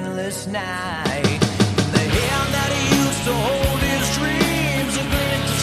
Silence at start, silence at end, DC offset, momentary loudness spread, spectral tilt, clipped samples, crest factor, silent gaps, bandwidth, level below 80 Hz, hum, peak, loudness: 0 s; 0 s; under 0.1%; 7 LU; -4.5 dB/octave; under 0.1%; 20 dB; none; 14 kHz; -34 dBFS; none; 0 dBFS; -20 LUFS